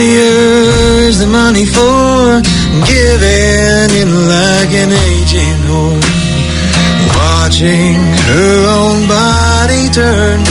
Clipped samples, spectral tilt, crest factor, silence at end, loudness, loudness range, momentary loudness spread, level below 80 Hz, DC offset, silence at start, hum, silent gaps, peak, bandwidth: 0.5%; -4.5 dB/octave; 8 dB; 0 s; -8 LUFS; 2 LU; 3 LU; -18 dBFS; under 0.1%; 0 s; none; none; 0 dBFS; 11 kHz